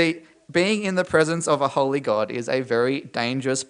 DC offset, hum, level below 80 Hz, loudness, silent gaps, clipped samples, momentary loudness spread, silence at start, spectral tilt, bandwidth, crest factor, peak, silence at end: under 0.1%; none; -64 dBFS; -22 LUFS; none; under 0.1%; 5 LU; 0 s; -4.5 dB/octave; 10.5 kHz; 18 dB; -4 dBFS; 0.05 s